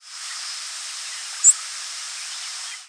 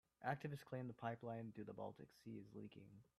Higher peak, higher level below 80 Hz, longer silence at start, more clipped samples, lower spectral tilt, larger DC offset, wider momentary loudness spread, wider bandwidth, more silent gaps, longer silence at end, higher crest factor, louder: first, -2 dBFS vs -30 dBFS; second, under -90 dBFS vs -84 dBFS; second, 0 s vs 0.2 s; neither; second, 9.5 dB/octave vs -7.5 dB/octave; neither; first, 15 LU vs 11 LU; second, 11 kHz vs 14.5 kHz; neither; second, 0 s vs 0.15 s; about the same, 24 dB vs 22 dB; first, -22 LUFS vs -52 LUFS